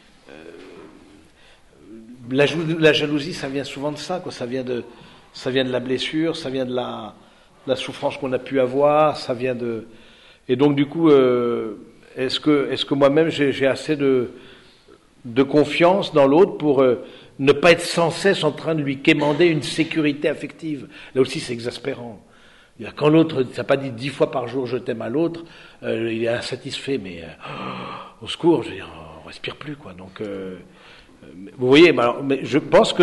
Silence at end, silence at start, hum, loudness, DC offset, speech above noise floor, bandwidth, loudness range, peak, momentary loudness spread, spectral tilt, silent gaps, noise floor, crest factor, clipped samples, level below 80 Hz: 0 s; 0.35 s; none; -20 LUFS; under 0.1%; 31 dB; 11.5 kHz; 8 LU; -2 dBFS; 18 LU; -5.5 dB/octave; none; -51 dBFS; 20 dB; under 0.1%; -56 dBFS